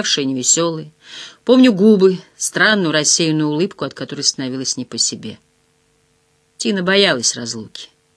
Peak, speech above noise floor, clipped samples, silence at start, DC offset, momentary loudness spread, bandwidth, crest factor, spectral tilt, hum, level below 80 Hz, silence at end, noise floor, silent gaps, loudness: 0 dBFS; 44 dB; under 0.1%; 0 s; under 0.1%; 19 LU; 11 kHz; 18 dB; -3 dB/octave; none; -66 dBFS; 0.3 s; -60 dBFS; none; -15 LUFS